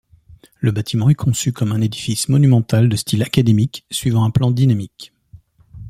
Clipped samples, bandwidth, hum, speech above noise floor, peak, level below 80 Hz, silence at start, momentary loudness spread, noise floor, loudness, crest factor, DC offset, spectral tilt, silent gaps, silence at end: under 0.1%; 15 kHz; none; 31 dB; 0 dBFS; -46 dBFS; 0.6 s; 7 LU; -47 dBFS; -17 LUFS; 16 dB; under 0.1%; -6 dB/octave; none; 0 s